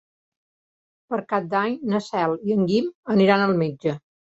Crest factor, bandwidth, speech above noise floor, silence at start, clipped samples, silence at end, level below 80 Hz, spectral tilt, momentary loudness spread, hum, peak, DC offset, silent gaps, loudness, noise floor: 20 dB; 8 kHz; over 68 dB; 1.1 s; under 0.1%; 0.35 s; -64 dBFS; -7.5 dB/octave; 10 LU; none; -4 dBFS; under 0.1%; 2.95-3.03 s; -22 LUFS; under -90 dBFS